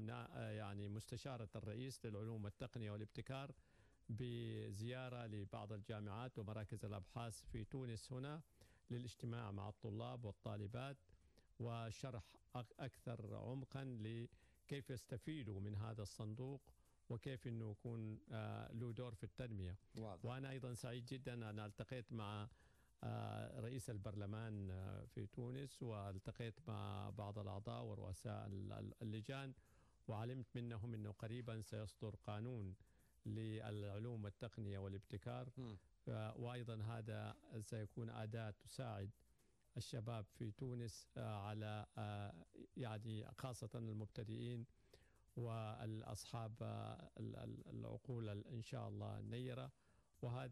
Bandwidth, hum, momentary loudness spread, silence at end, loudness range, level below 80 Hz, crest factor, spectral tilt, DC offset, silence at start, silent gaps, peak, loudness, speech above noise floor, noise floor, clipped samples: 13 kHz; none; 4 LU; 0 s; 1 LU; -72 dBFS; 12 dB; -6.5 dB/octave; under 0.1%; 0 s; none; -38 dBFS; -52 LUFS; 28 dB; -78 dBFS; under 0.1%